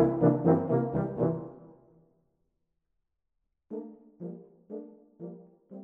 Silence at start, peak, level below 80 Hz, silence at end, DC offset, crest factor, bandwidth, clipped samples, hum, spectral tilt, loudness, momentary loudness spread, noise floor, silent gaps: 0 s; -10 dBFS; -62 dBFS; 0 s; under 0.1%; 22 dB; 2.7 kHz; under 0.1%; none; -12.5 dB/octave; -27 LUFS; 24 LU; -83 dBFS; none